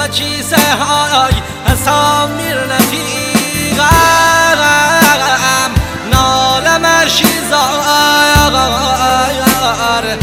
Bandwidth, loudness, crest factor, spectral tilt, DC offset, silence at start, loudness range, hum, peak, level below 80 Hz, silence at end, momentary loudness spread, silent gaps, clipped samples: over 20 kHz; -10 LUFS; 10 dB; -3 dB/octave; under 0.1%; 0 s; 3 LU; none; 0 dBFS; -26 dBFS; 0 s; 6 LU; none; 0.5%